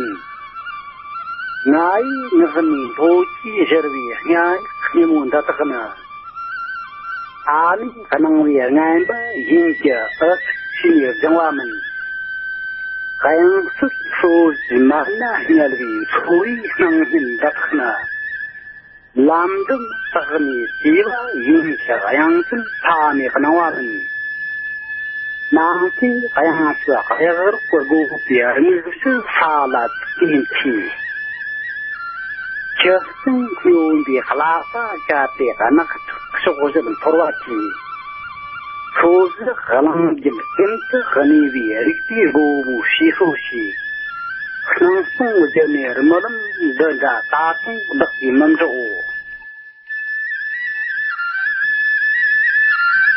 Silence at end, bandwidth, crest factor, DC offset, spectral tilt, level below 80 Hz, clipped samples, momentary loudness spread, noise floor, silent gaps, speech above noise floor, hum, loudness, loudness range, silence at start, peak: 0 s; 5.6 kHz; 16 dB; under 0.1%; -10 dB/octave; -58 dBFS; under 0.1%; 11 LU; -39 dBFS; none; 24 dB; none; -16 LUFS; 3 LU; 0 s; 0 dBFS